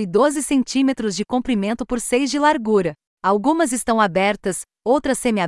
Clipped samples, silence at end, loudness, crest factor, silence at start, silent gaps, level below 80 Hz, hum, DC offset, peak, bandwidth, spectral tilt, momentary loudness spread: under 0.1%; 0 s; -19 LUFS; 14 dB; 0 s; 3.07-3.17 s; -48 dBFS; none; under 0.1%; -4 dBFS; 12 kHz; -4.5 dB/octave; 6 LU